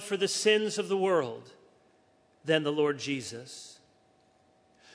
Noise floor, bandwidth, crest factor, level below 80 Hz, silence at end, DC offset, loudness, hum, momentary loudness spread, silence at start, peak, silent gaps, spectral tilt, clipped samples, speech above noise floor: -65 dBFS; 11 kHz; 20 dB; -82 dBFS; 1.2 s; under 0.1%; -29 LUFS; none; 19 LU; 0 s; -10 dBFS; none; -3.5 dB/octave; under 0.1%; 36 dB